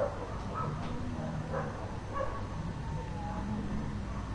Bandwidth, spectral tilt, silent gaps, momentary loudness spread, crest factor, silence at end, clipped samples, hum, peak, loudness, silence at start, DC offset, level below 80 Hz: 11 kHz; -7 dB/octave; none; 3 LU; 14 dB; 0 s; under 0.1%; none; -22 dBFS; -38 LUFS; 0 s; 0.1%; -44 dBFS